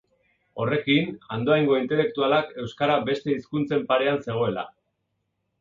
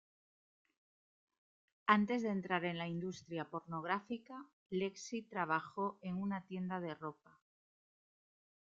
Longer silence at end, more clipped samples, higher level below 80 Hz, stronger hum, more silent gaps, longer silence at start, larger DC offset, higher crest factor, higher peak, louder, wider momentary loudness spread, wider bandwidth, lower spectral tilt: second, 0.95 s vs 1.65 s; neither; first, -62 dBFS vs -80 dBFS; neither; second, none vs 4.53-4.66 s; second, 0.55 s vs 1.85 s; neither; second, 18 dB vs 28 dB; first, -8 dBFS vs -14 dBFS; first, -24 LUFS vs -40 LUFS; second, 9 LU vs 13 LU; about the same, 7.4 kHz vs 7.8 kHz; first, -7.5 dB/octave vs -4.5 dB/octave